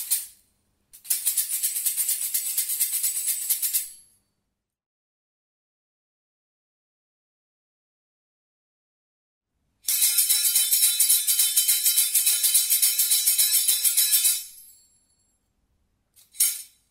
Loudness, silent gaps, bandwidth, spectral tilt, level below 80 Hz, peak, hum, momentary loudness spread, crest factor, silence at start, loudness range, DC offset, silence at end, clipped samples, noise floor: -20 LUFS; 4.86-9.41 s; 16.5 kHz; 6 dB/octave; -76 dBFS; -6 dBFS; none; 8 LU; 20 dB; 0 s; 10 LU; under 0.1%; 0.25 s; under 0.1%; -80 dBFS